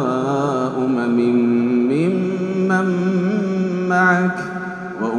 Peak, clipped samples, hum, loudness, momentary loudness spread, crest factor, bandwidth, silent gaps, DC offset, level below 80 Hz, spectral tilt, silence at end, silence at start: -2 dBFS; under 0.1%; none; -18 LUFS; 7 LU; 16 dB; 9.6 kHz; none; under 0.1%; -60 dBFS; -7.5 dB/octave; 0 s; 0 s